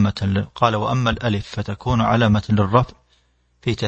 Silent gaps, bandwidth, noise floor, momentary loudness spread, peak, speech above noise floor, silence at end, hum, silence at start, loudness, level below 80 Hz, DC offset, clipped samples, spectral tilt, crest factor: none; 8.2 kHz; -61 dBFS; 9 LU; 0 dBFS; 42 dB; 0 s; none; 0 s; -20 LUFS; -40 dBFS; under 0.1%; under 0.1%; -7 dB/octave; 18 dB